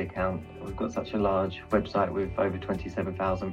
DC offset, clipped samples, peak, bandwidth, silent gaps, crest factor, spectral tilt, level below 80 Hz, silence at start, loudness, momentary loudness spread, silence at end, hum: under 0.1%; under 0.1%; -12 dBFS; 11 kHz; none; 18 dB; -7.5 dB/octave; -46 dBFS; 0 s; -30 LUFS; 6 LU; 0 s; none